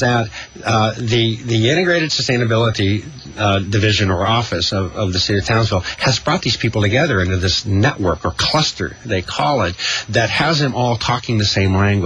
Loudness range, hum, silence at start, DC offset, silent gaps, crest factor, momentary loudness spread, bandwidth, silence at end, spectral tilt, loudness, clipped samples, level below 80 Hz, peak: 1 LU; none; 0 s; under 0.1%; none; 14 dB; 5 LU; 10.5 kHz; 0 s; -5 dB/octave; -16 LUFS; under 0.1%; -40 dBFS; -2 dBFS